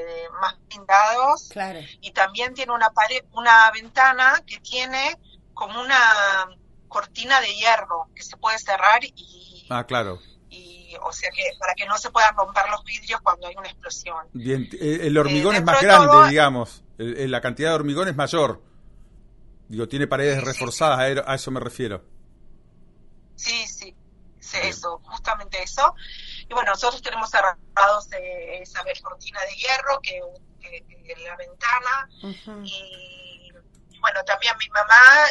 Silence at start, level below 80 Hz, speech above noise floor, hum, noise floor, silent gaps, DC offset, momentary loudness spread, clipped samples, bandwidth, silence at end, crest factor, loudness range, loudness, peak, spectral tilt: 0 s; -50 dBFS; 30 dB; none; -51 dBFS; none; under 0.1%; 20 LU; under 0.1%; 11.5 kHz; 0 s; 22 dB; 12 LU; -19 LUFS; 0 dBFS; -3.5 dB/octave